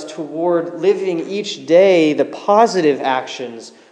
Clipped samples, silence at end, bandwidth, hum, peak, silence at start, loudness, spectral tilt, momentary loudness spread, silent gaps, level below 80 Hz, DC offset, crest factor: under 0.1%; 0.2 s; 10 kHz; none; 0 dBFS; 0 s; -16 LUFS; -5 dB/octave; 15 LU; none; -78 dBFS; under 0.1%; 16 dB